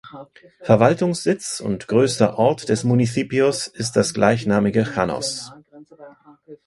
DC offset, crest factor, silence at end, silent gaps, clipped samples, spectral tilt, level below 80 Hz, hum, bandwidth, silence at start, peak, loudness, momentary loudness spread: under 0.1%; 20 dB; 0.1 s; none; under 0.1%; -5.5 dB/octave; -52 dBFS; none; 11.5 kHz; 0.05 s; 0 dBFS; -19 LUFS; 9 LU